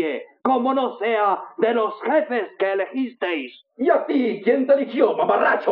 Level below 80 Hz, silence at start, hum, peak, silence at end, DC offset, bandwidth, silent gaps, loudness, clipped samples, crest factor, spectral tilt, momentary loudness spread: -76 dBFS; 0 s; none; -4 dBFS; 0 s; under 0.1%; 5.2 kHz; none; -21 LUFS; under 0.1%; 16 dB; -2.5 dB/octave; 8 LU